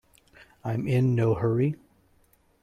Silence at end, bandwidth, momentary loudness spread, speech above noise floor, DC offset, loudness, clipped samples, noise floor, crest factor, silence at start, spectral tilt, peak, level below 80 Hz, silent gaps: 0.9 s; 9.8 kHz; 13 LU; 39 dB; under 0.1%; -26 LUFS; under 0.1%; -64 dBFS; 16 dB; 0.65 s; -9.5 dB/octave; -12 dBFS; -58 dBFS; none